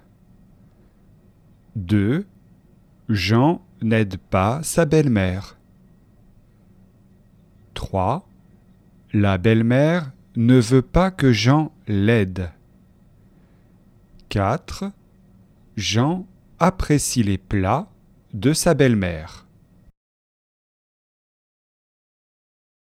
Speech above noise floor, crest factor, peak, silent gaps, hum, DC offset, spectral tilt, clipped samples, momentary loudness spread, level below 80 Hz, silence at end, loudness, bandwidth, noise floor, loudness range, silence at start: 34 dB; 22 dB; 0 dBFS; none; none; under 0.1%; -6 dB/octave; under 0.1%; 16 LU; -40 dBFS; 3.5 s; -20 LUFS; 15 kHz; -53 dBFS; 11 LU; 1.75 s